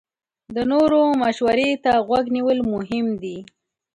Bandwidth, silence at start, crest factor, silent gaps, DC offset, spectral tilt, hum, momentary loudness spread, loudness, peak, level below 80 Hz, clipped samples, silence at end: 11 kHz; 0.5 s; 14 dB; none; under 0.1%; -6 dB/octave; none; 12 LU; -20 LUFS; -6 dBFS; -54 dBFS; under 0.1%; 0.5 s